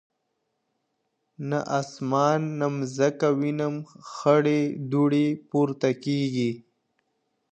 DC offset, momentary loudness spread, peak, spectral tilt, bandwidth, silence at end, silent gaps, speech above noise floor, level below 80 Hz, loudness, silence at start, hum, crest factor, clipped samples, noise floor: under 0.1%; 8 LU; -6 dBFS; -7 dB/octave; 8.8 kHz; 0.9 s; none; 53 dB; -74 dBFS; -25 LUFS; 1.4 s; none; 20 dB; under 0.1%; -77 dBFS